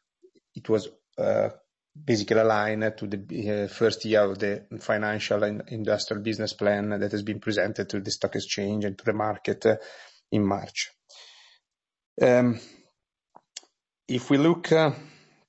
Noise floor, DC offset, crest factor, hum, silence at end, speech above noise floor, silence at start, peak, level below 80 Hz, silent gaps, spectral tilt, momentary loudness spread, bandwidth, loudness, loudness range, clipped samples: -77 dBFS; under 0.1%; 20 dB; none; 0.4 s; 52 dB; 0.55 s; -6 dBFS; -68 dBFS; 12.06-12.16 s; -5.5 dB/octave; 12 LU; 8.2 kHz; -26 LUFS; 3 LU; under 0.1%